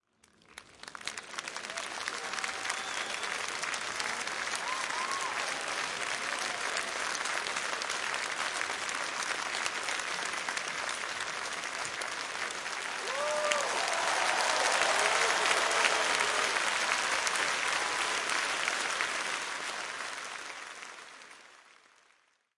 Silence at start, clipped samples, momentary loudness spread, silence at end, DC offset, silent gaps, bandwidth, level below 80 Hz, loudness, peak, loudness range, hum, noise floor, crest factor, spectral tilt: 0.5 s; under 0.1%; 12 LU; 0.9 s; under 0.1%; none; 11.5 kHz; -72 dBFS; -31 LUFS; -8 dBFS; 8 LU; none; -69 dBFS; 26 dB; 0.5 dB/octave